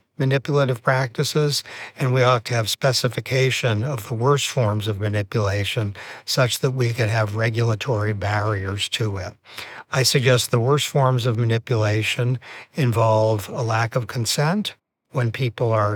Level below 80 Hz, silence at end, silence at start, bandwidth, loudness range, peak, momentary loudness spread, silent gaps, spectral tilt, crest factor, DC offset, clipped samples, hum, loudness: -62 dBFS; 0 s; 0.2 s; 19.5 kHz; 2 LU; -4 dBFS; 8 LU; none; -5 dB/octave; 18 dB; under 0.1%; under 0.1%; none; -21 LUFS